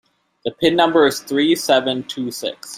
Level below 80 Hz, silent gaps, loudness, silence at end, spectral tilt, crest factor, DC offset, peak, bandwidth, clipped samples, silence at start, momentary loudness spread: -58 dBFS; none; -17 LUFS; 0 s; -3.5 dB/octave; 16 dB; under 0.1%; -2 dBFS; 16 kHz; under 0.1%; 0.45 s; 12 LU